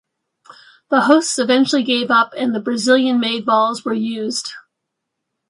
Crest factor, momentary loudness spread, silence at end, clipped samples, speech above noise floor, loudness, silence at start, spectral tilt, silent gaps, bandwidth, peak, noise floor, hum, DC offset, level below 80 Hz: 18 dB; 8 LU; 0.9 s; under 0.1%; 61 dB; -16 LUFS; 0.9 s; -3 dB/octave; none; 11.5 kHz; 0 dBFS; -78 dBFS; none; under 0.1%; -70 dBFS